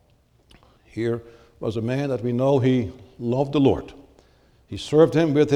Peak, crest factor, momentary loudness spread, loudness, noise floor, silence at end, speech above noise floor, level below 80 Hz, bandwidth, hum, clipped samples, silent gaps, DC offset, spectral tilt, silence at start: -4 dBFS; 18 dB; 16 LU; -22 LUFS; -60 dBFS; 0 s; 39 dB; -52 dBFS; 11.5 kHz; none; under 0.1%; none; under 0.1%; -7.5 dB/octave; 0.95 s